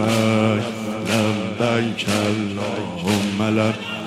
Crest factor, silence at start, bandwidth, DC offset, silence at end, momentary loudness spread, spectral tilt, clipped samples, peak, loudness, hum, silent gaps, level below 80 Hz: 16 dB; 0 s; 15.5 kHz; under 0.1%; 0 s; 7 LU; -5.5 dB/octave; under 0.1%; -4 dBFS; -21 LUFS; none; none; -56 dBFS